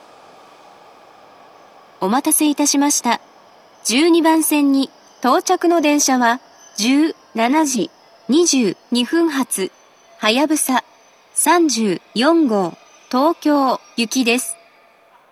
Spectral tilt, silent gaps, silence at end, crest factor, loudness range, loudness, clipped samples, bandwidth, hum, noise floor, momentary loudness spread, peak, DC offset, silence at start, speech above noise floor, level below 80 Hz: -2.5 dB/octave; none; 0.8 s; 18 dB; 3 LU; -17 LUFS; under 0.1%; 14.5 kHz; none; -51 dBFS; 9 LU; 0 dBFS; under 0.1%; 2 s; 35 dB; -80 dBFS